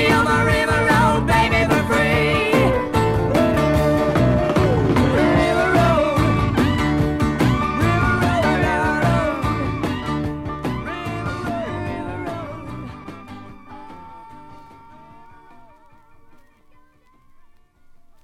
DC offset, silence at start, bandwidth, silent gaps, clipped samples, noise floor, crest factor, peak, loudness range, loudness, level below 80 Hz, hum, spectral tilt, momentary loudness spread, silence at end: under 0.1%; 0 s; 15.5 kHz; none; under 0.1%; -52 dBFS; 16 dB; -4 dBFS; 14 LU; -18 LUFS; -34 dBFS; none; -6.5 dB/octave; 17 LU; 2.6 s